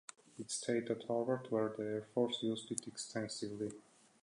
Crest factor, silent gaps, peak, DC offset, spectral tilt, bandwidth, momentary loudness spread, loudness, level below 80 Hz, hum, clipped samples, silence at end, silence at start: 22 dB; none; -18 dBFS; under 0.1%; -4 dB/octave; 11 kHz; 8 LU; -40 LUFS; -82 dBFS; none; under 0.1%; 0.45 s; 0.35 s